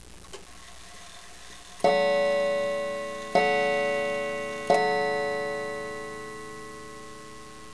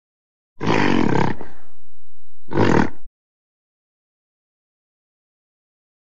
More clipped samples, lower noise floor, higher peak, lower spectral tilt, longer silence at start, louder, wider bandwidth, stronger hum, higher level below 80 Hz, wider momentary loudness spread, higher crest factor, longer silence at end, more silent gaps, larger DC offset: neither; second, -47 dBFS vs -61 dBFS; second, -8 dBFS vs -2 dBFS; second, -3.5 dB/octave vs -6.5 dB/octave; second, 0 s vs 0.55 s; second, -27 LUFS vs -20 LUFS; first, 11 kHz vs 8.2 kHz; neither; second, -58 dBFS vs -44 dBFS; first, 21 LU vs 9 LU; about the same, 20 dB vs 22 dB; second, 0 s vs 2.95 s; neither; second, 0.4% vs 10%